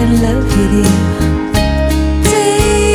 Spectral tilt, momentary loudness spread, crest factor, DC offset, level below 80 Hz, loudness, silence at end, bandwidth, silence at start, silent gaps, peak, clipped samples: -5.5 dB/octave; 3 LU; 10 dB; under 0.1%; -18 dBFS; -12 LUFS; 0 s; 20 kHz; 0 s; none; 0 dBFS; under 0.1%